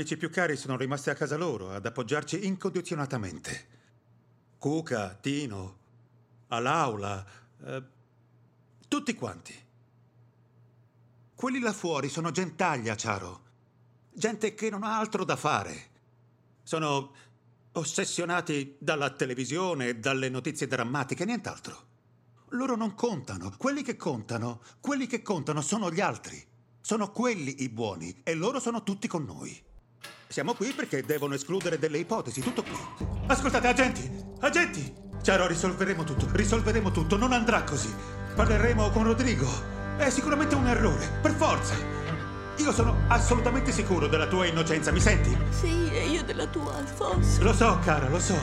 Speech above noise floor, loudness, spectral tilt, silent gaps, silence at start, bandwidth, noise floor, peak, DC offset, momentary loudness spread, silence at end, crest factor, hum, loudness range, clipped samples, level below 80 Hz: 35 dB; -29 LUFS; -5 dB/octave; none; 0 s; 15.5 kHz; -63 dBFS; -6 dBFS; under 0.1%; 13 LU; 0 s; 22 dB; none; 9 LU; under 0.1%; -38 dBFS